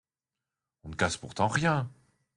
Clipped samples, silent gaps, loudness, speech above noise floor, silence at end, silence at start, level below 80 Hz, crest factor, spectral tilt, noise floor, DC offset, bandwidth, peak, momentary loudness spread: under 0.1%; none; -29 LUFS; over 61 dB; 0.5 s; 0.85 s; -60 dBFS; 22 dB; -5 dB/octave; under -90 dBFS; under 0.1%; 11.5 kHz; -10 dBFS; 13 LU